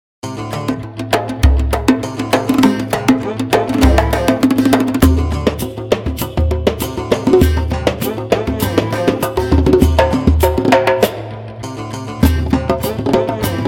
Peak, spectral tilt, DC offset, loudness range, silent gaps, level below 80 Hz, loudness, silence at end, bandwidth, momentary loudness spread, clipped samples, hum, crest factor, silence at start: 0 dBFS; -6.5 dB/octave; under 0.1%; 2 LU; none; -22 dBFS; -15 LUFS; 0 s; 17.5 kHz; 10 LU; under 0.1%; none; 14 dB; 0.25 s